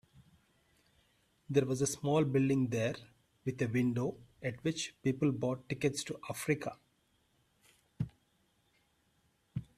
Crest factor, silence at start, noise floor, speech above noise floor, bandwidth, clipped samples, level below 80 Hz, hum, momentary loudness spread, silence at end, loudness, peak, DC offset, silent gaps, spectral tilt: 22 dB; 0.2 s; -74 dBFS; 41 dB; 15 kHz; under 0.1%; -66 dBFS; none; 12 LU; 0.15 s; -35 LUFS; -16 dBFS; under 0.1%; none; -5.5 dB/octave